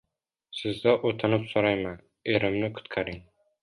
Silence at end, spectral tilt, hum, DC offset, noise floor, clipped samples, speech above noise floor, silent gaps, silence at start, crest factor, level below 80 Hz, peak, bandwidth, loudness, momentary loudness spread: 0.4 s; -7 dB/octave; none; under 0.1%; -67 dBFS; under 0.1%; 41 dB; none; 0.5 s; 22 dB; -56 dBFS; -6 dBFS; 11.5 kHz; -27 LUFS; 12 LU